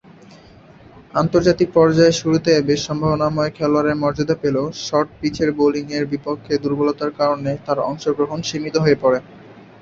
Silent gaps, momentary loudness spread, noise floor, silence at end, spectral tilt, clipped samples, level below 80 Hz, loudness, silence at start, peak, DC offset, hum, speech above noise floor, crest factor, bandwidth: none; 8 LU; -45 dBFS; 0.2 s; -6 dB/octave; under 0.1%; -48 dBFS; -18 LUFS; 1.15 s; -2 dBFS; under 0.1%; none; 27 dB; 16 dB; 7.8 kHz